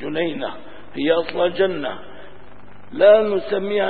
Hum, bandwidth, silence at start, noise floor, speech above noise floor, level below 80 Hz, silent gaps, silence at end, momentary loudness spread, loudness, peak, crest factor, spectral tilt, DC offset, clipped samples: 50 Hz at -55 dBFS; 4.8 kHz; 0 s; -45 dBFS; 27 dB; -56 dBFS; none; 0 s; 22 LU; -19 LUFS; -2 dBFS; 18 dB; -10 dB/octave; 2%; under 0.1%